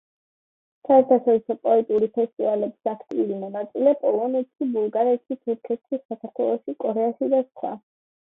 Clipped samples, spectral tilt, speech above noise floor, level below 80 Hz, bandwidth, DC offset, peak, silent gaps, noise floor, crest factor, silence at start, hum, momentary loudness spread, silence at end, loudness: under 0.1%; -10 dB/octave; over 68 dB; -74 dBFS; 3.9 kHz; under 0.1%; -4 dBFS; 2.33-2.37 s, 6.05-6.09 s; under -90 dBFS; 18 dB; 0.9 s; none; 12 LU; 0.5 s; -23 LUFS